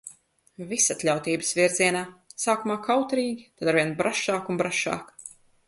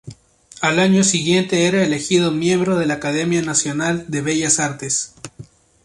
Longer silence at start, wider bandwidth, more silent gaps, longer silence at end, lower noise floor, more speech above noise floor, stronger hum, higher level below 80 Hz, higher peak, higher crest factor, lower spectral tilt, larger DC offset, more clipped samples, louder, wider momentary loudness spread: about the same, 0.05 s vs 0.05 s; about the same, 12 kHz vs 11.5 kHz; neither; about the same, 0.4 s vs 0.4 s; first, -50 dBFS vs -45 dBFS; about the same, 25 dB vs 27 dB; neither; second, -68 dBFS vs -54 dBFS; second, -6 dBFS vs -2 dBFS; about the same, 20 dB vs 18 dB; about the same, -3 dB/octave vs -4 dB/octave; neither; neither; second, -25 LUFS vs -17 LUFS; first, 16 LU vs 7 LU